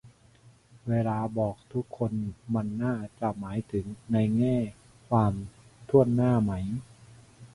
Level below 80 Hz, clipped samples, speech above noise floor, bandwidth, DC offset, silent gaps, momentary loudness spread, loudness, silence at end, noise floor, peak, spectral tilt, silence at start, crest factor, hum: -52 dBFS; under 0.1%; 30 dB; 11.5 kHz; under 0.1%; none; 12 LU; -29 LUFS; 0.1 s; -58 dBFS; -8 dBFS; -9.5 dB/octave; 0.05 s; 22 dB; none